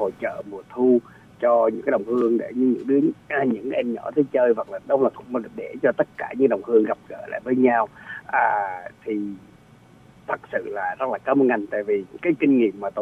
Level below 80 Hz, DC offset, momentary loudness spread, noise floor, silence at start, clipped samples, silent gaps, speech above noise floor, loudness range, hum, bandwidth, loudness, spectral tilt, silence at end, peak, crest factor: -64 dBFS; under 0.1%; 11 LU; -51 dBFS; 0 s; under 0.1%; none; 29 dB; 4 LU; none; 4.2 kHz; -22 LUFS; -8.5 dB/octave; 0 s; -6 dBFS; 18 dB